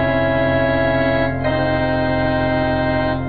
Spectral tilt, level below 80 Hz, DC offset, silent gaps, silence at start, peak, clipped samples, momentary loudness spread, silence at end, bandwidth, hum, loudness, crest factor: -9.5 dB/octave; -34 dBFS; 2%; none; 0 s; -6 dBFS; under 0.1%; 2 LU; 0 s; 5 kHz; none; -18 LUFS; 12 dB